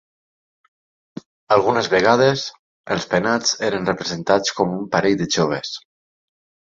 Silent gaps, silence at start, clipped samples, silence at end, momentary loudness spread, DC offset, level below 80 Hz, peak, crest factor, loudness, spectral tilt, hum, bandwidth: 2.59-2.84 s; 1.5 s; under 0.1%; 0.95 s; 16 LU; under 0.1%; -56 dBFS; -2 dBFS; 20 dB; -19 LUFS; -4 dB/octave; none; 7.8 kHz